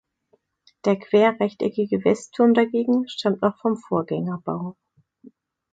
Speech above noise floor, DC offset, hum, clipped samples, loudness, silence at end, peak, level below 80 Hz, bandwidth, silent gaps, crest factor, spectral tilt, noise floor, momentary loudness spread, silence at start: 44 dB; under 0.1%; none; under 0.1%; -22 LUFS; 0.45 s; -6 dBFS; -66 dBFS; 9 kHz; none; 18 dB; -6.5 dB/octave; -66 dBFS; 10 LU; 0.85 s